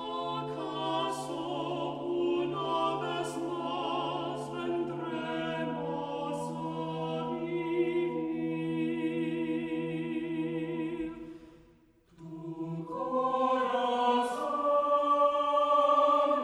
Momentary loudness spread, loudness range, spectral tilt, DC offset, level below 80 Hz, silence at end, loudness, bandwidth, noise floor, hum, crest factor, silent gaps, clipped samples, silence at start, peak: 10 LU; 7 LU; -6 dB/octave; under 0.1%; -68 dBFS; 0 s; -31 LUFS; 12 kHz; -62 dBFS; none; 18 dB; none; under 0.1%; 0 s; -14 dBFS